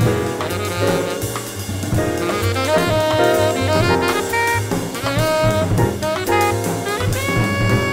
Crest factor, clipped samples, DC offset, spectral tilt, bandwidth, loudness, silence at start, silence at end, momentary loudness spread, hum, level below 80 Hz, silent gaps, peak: 14 dB; under 0.1%; under 0.1%; -5 dB/octave; 16.5 kHz; -18 LUFS; 0 s; 0 s; 6 LU; none; -36 dBFS; none; -4 dBFS